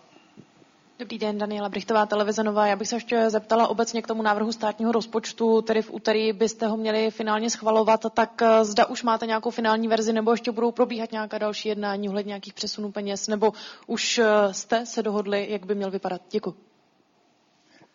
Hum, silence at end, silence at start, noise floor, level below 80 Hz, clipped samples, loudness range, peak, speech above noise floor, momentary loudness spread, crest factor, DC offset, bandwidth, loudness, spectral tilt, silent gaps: none; 1.4 s; 0.35 s; -64 dBFS; -70 dBFS; under 0.1%; 5 LU; -8 dBFS; 40 dB; 9 LU; 18 dB; under 0.1%; 7.6 kHz; -24 LUFS; -4 dB/octave; none